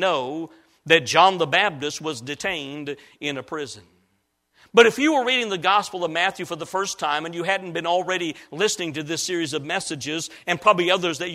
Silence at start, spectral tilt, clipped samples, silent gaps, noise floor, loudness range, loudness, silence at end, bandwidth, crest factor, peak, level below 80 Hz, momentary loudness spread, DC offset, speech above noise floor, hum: 0 s; -3 dB/octave; under 0.1%; none; -70 dBFS; 4 LU; -22 LUFS; 0 s; 15 kHz; 22 dB; 0 dBFS; -66 dBFS; 14 LU; under 0.1%; 48 dB; none